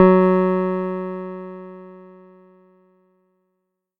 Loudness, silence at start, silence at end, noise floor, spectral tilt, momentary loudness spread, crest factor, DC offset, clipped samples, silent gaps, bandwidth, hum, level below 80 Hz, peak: -20 LUFS; 0 s; 2 s; -76 dBFS; -11 dB/octave; 24 LU; 20 dB; under 0.1%; under 0.1%; none; 4.3 kHz; none; -62 dBFS; 0 dBFS